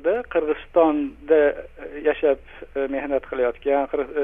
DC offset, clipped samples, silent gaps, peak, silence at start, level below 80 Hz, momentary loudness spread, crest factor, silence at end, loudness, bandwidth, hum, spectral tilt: under 0.1%; under 0.1%; none; -6 dBFS; 0 s; -48 dBFS; 9 LU; 16 dB; 0 s; -22 LUFS; 3.8 kHz; 60 Hz at -60 dBFS; -8 dB/octave